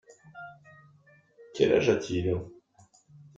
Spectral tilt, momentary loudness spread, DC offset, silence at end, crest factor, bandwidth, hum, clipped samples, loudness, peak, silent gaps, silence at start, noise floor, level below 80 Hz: -6 dB/octave; 24 LU; under 0.1%; 0.85 s; 22 dB; 7.8 kHz; none; under 0.1%; -27 LUFS; -8 dBFS; none; 0.35 s; -61 dBFS; -60 dBFS